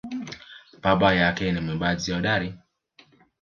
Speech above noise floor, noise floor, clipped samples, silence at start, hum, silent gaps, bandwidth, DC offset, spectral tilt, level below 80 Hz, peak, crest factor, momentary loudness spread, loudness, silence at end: 35 dB; -58 dBFS; under 0.1%; 0.05 s; none; none; 7.2 kHz; under 0.1%; -5.5 dB/octave; -48 dBFS; -4 dBFS; 22 dB; 16 LU; -24 LUFS; 0.85 s